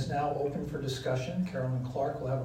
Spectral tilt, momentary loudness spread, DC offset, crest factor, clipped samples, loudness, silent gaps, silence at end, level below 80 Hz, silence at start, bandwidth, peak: -7 dB/octave; 3 LU; under 0.1%; 14 dB; under 0.1%; -33 LUFS; none; 0 s; -54 dBFS; 0 s; 14 kHz; -20 dBFS